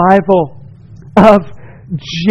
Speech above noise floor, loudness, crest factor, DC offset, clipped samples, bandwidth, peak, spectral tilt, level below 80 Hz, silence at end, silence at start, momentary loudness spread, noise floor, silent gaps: 25 dB; -11 LUFS; 12 dB; under 0.1%; 2%; 8.6 kHz; 0 dBFS; -7 dB/octave; -38 dBFS; 0 s; 0 s; 17 LU; -34 dBFS; none